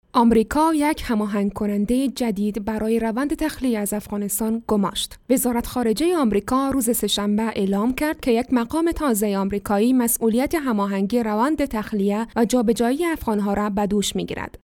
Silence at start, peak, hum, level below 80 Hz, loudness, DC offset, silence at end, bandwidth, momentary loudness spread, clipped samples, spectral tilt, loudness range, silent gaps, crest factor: 0.15 s; -6 dBFS; none; -42 dBFS; -21 LUFS; under 0.1%; 0.2 s; 18.5 kHz; 5 LU; under 0.1%; -5 dB/octave; 2 LU; none; 14 dB